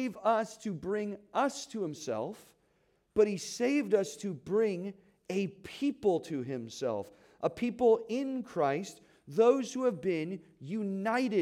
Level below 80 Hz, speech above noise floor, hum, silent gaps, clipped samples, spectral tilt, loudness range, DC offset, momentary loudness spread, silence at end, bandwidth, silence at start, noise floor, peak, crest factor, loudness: -72 dBFS; 41 dB; none; none; under 0.1%; -5.5 dB/octave; 4 LU; under 0.1%; 12 LU; 0 s; 14.5 kHz; 0 s; -72 dBFS; -14 dBFS; 18 dB; -32 LUFS